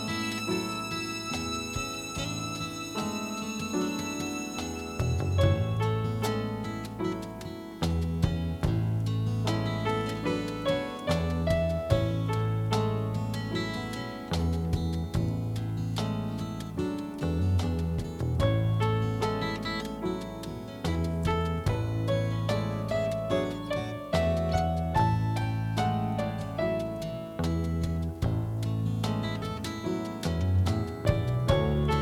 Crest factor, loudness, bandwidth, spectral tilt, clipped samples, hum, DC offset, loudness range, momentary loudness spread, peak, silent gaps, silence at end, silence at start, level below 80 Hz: 18 dB; -30 LUFS; 15.5 kHz; -6 dB/octave; under 0.1%; none; under 0.1%; 3 LU; 7 LU; -10 dBFS; none; 0 s; 0 s; -42 dBFS